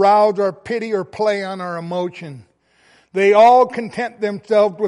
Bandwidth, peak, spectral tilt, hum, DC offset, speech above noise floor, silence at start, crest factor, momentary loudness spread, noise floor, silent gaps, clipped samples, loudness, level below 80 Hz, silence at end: 11 kHz; -2 dBFS; -6 dB/octave; none; under 0.1%; 39 dB; 0 s; 14 dB; 15 LU; -55 dBFS; none; under 0.1%; -17 LUFS; -64 dBFS; 0 s